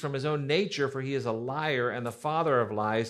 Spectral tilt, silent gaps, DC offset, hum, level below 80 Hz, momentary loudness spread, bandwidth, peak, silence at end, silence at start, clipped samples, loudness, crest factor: -6 dB/octave; none; under 0.1%; none; -70 dBFS; 5 LU; 13.5 kHz; -14 dBFS; 0 s; 0 s; under 0.1%; -29 LUFS; 16 dB